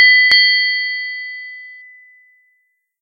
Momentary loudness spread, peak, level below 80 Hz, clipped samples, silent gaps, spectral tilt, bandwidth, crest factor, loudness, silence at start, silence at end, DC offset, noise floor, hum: 23 LU; 0 dBFS; -66 dBFS; under 0.1%; none; 1.5 dB/octave; 9.4 kHz; 16 dB; -11 LUFS; 0 s; 1.25 s; under 0.1%; -65 dBFS; none